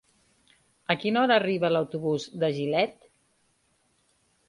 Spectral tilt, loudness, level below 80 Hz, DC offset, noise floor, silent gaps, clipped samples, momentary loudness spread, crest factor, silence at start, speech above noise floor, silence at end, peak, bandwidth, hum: -6 dB/octave; -26 LUFS; -70 dBFS; under 0.1%; -69 dBFS; none; under 0.1%; 8 LU; 22 dB; 0.9 s; 44 dB; 1.55 s; -6 dBFS; 11.5 kHz; none